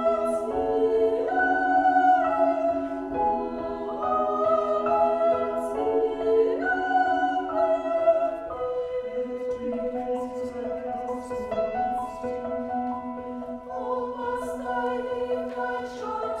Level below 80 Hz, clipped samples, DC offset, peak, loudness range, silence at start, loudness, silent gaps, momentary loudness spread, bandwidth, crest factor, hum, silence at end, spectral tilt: -54 dBFS; under 0.1%; under 0.1%; -10 dBFS; 7 LU; 0 s; -26 LUFS; none; 10 LU; 12 kHz; 16 dB; none; 0 s; -5.5 dB/octave